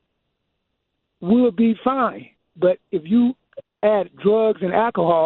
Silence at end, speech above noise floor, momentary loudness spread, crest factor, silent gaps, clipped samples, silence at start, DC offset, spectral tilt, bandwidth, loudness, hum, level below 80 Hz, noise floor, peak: 0 s; 57 dB; 7 LU; 16 dB; none; under 0.1%; 1.2 s; under 0.1%; -10.5 dB/octave; 4.2 kHz; -19 LUFS; none; -60 dBFS; -75 dBFS; -4 dBFS